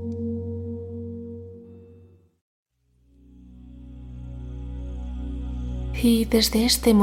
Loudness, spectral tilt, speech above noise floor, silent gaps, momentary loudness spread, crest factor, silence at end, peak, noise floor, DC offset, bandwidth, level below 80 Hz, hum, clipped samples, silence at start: -25 LUFS; -4.5 dB/octave; 43 dB; 2.41-2.66 s; 24 LU; 20 dB; 0 s; -6 dBFS; -62 dBFS; under 0.1%; 17 kHz; -36 dBFS; none; under 0.1%; 0 s